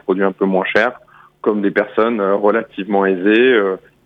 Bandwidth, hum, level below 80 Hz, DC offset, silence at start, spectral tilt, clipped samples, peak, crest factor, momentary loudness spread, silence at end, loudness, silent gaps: 6.6 kHz; none; -64 dBFS; under 0.1%; 0.1 s; -7.5 dB/octave; under 0.1%; -2 dBFS; 14 dB; 8 LU; 0.3 s; -16 LUFS; none